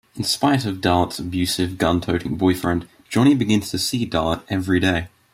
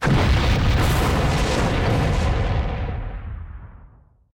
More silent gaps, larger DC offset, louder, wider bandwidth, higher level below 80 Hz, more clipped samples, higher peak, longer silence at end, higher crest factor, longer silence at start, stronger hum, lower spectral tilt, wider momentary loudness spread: neither; neither; about the same, -20 LUFS vs -21 LUFS; about the same, 16 kHz vs 17 kHz; second, -46 dBFS vs -26 dBFS; neither; first, -4 dBFS vs -12 dBFS; second, 0.25 s vs 0.5 s; first, 16 dB vs 8 dB; first, 0.15 s vs 0 s; neither; about the same, -5 dB/octave vs -6 dB/octave; second, 6 LU vs 16 LU